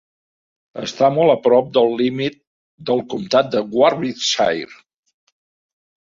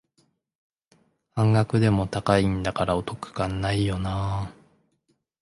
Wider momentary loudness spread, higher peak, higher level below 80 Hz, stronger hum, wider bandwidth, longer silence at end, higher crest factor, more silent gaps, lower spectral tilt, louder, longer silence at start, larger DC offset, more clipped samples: first, 14 LU vs 10 LU; first, -2 dBFS vs -6 dBFS; second, -62 dBFS vs -44 dBFS; neither; second, 7.6 kHz vs 11.5 kHz; first, 1.3 s vs 0.9 s; about the same, 18 dB vs 20 dB; first, 2.47-2.78 s vs none; second, -4.5 dB/octave vs -7 dB/octave; first, -17 LUFS vs -25 LUFS; second, 0.75 s vs 1.35 s; neither; neither